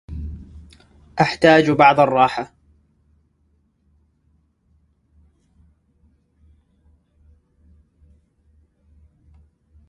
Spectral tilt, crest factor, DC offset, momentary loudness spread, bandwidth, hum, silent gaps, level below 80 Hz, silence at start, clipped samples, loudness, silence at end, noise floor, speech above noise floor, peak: -6 dB/octave; 24 dB; under 0.1%; 22 LU; 11.5 kHz; none; none; -46 dBFS; 0.1 s; under 0.1%; -15 LUFS; 7.45 s; -63 dBFS; 49 dB; 0 dBFS